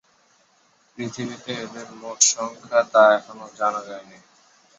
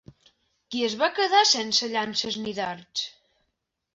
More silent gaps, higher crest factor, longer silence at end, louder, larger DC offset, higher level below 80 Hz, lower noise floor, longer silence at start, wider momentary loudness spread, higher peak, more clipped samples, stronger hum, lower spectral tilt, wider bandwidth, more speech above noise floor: neither; about the same, 22 dB vs 20 dB; about the same, 0.75 s vs 0.85 s; first, -21 LUFS vs -24 LUFS; neither; about the same, -72 dBFS vs -68 dBFS; second, -61 dBFS vs -78 dBFS; first, 1 s vs 0.7 s; first, 21 LU vs 12 LU; first, -2 dBFS vs -8 dBFS; neither; neither; about the same, -1.5 dB/octave vs -1.5 dB/octave; about the same, 8.4 kHz vs 8 kHz; second, 39 dB vs 53 dB